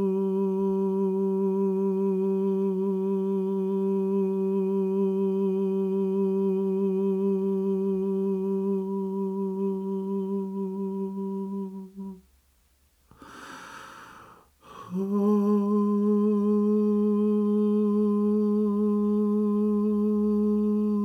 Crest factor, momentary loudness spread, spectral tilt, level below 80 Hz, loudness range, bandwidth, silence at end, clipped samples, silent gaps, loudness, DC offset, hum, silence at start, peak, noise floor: 12 dB; 9 LU; -10.5 dB/octave; -64 dBFS; 11 LU; 6.2 kHz; 0 s; under 0.1%; none; -26 LUFS; under 0.1%; none; 0 s; -14 dBFS; -65 dBFS